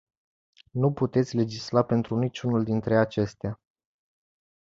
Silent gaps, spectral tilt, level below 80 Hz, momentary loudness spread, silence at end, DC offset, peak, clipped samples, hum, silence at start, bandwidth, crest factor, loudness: none; -7.5 dB/octave; -58 dBFS; 11 LU; 1.15 s; under 0.1%; -6 dBFS; under 0.1%; none; 0.75 s; 7.8 kHz; 20 dB; -26 LUFS